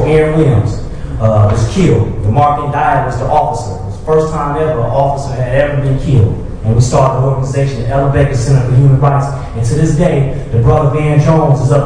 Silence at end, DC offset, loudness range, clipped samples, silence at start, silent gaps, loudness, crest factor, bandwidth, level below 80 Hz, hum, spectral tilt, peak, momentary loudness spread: 0 s; under 0.1%; 2 LU; under 0.1%; 0 s; none; -12 LUFS; 10 dB; 10 kHz; -24 dBFS; none; -7.5 dB/octave; 0 dBFS; 6 LU